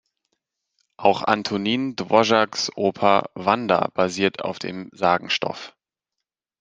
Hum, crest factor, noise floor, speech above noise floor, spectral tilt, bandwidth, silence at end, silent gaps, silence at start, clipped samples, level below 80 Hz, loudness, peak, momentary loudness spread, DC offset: none; 22 dB; -85 dBFS; 63 dB; -4.5 dB/octave; 9.8 kHz; 0.9 s; none; 1 s; under 0.1%; -66 dBFS; -21 LUFS; 0 dBFS; 10 LU; under 0.1%